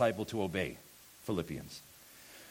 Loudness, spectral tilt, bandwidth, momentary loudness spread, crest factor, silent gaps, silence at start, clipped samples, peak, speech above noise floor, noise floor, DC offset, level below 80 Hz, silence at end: -38 LUFS; -5.5 dB/octave; 17 kHz; 18 LU; 22 dB; none; 0 s; under 0.1%; -16 dBFS; 20 dB; -56 dBFS; under 0.1%; -62 dBFS; 0 s